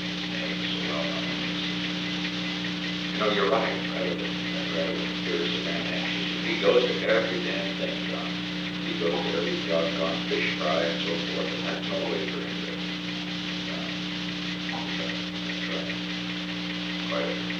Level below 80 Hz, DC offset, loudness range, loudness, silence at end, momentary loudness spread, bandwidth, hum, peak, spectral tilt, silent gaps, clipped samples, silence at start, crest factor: -56 dBFS; under 0.1%; 4 LU; -28 LUFS; 0 s; 6 LU; 9 kHz; 60 Hz at -35 dBFS; -8 dBFS; -5 dB/octave; none; under 0.1%; 0 s; 20 dB